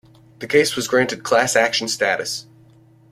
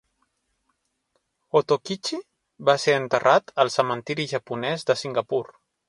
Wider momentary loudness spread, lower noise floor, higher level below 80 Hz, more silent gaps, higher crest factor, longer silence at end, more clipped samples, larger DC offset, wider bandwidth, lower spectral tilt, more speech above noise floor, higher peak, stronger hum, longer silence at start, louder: about the same, 10 LU vs 9 LU; second, -50 dBFS vs -74 dBFS; first, -60 dBFS vs -68 dBFS; neither; about the same, 18 dB vs 22 dB; first, 0.7 s vs 0.4 s; neither; neither; first, 16 kHz vs 11.5 kHz; second, -2.5 dB/octave vs -4 dB/octave; second, 31 dB vs 51 dB; about the same, -2 dBFS vs -4 dBFS; neither; second, 0.4 s vs 1.55 s; first, -18 LUFS vs -23 LUFS